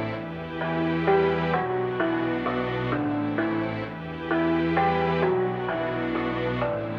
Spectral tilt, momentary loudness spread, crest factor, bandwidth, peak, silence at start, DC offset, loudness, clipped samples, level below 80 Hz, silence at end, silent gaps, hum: -8.5 dB/octave; 8 LU; 16 dB; 6.2 kHz; -8 dBFS; 0 s; under 0.1%; -26 LUFS; under 0.1%; -50 dBFS; 0 s; none; none